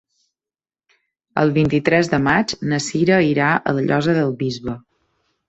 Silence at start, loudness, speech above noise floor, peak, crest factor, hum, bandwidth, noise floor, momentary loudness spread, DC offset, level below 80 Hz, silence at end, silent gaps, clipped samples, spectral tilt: 1.35 s; -18 LUFS; over 73 dB; 0 dBFS; 18 dB; none; 8.2 kHz; under -90 dBFS; 9 LU; under 0.1%; -50 dBFS; 0.7 s; none; under 0.1%; -6 dB/octave